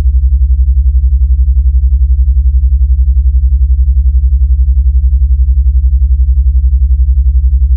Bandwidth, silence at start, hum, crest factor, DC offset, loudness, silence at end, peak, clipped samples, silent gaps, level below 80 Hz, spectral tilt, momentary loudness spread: 0.3 kHz; 0 s; none; 6 dB; under 0.1%; -10 LUFS; 0 s; 0 dBFS; under 0.1%; none; -8 dBFS; -14 dB/octave; 1 LU